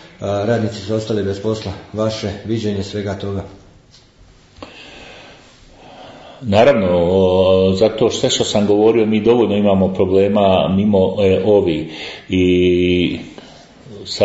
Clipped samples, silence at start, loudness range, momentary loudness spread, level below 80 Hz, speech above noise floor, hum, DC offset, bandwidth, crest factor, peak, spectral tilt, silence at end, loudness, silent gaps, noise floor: under 0.1%; 0.2 s; 13 LU; 15 LU; -48 dBFS; 32 dB; none; under 0.1%; 8 kHz; 16 dB; 0 dBFS; -6 dB/octave; 0 s; -15 LUFS; none; -47 dBFS